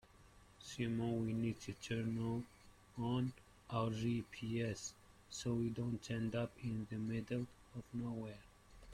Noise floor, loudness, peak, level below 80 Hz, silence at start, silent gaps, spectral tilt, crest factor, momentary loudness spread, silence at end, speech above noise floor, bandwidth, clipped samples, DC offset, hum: -65 dBFS; -43 LUFS; -26 dBFS; -66 dBFS; 0.05 s; none; -6 dB/octave; 18 dB; 12 LU; 0 s; 23 dB; 13.5 kHz; under 0.1%; under 0.1%; 60 Hz at -60 dBFS